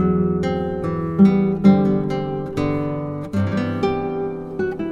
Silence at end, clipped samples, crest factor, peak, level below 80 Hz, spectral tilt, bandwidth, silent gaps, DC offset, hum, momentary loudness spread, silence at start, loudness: 0 s; under 0.1%; 18 dB; 0 dBFS; -42 dBFS; -9 dB/octave; 7.2 kHz; none; under 0.1%; none; 10 LU; 0 s; -20 LUFS